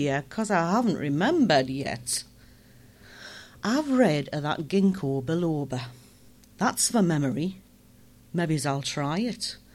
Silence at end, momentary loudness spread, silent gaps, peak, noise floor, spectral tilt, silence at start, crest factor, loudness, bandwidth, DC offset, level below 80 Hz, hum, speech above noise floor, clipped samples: 0.2 s; 11 LU; none; -8 dBFS; -54 dBFS; -5 dB/octave; 0 s; 18 dB; -26 LUFS; 15.5 kHz; under 0.1%; -60 dBFS; none; 29 dB; under 0.1%